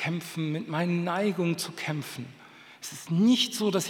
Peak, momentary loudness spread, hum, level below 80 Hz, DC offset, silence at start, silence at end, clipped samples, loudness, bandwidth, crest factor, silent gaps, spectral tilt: -12 dBFS; 17 LU; none; -86 dBFS; under 0.1%; 0 s; 0 s; under 0.1%; -28 LUFS; 18 kHz; 16 dB; none; -5 dB/octave